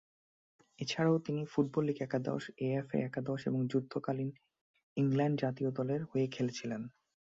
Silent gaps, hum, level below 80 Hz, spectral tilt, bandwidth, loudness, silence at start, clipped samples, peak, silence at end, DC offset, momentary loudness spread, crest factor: 4.61-4.74 s, 4.83-4.96 s; none; -74 dBFS; -7 dB/octave; 7.8 kHz; -35 LUFS; 0.8 s; under 0.1%; -18 dBFS; 0.4 s; under 0.1%; 9 LU; 18 dB